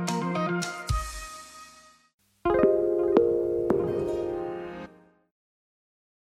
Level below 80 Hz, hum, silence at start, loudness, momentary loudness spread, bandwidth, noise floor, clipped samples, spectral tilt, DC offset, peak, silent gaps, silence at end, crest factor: -44 dBFS; none; 0 s; -27 LUFS; 19 LU; 15 kHz; -54 dBFS; under 0.1%; -6 dB/octave; under 0.1%; -6 dBFS; 2.14-2.18 s; 1.45 s; 22 dB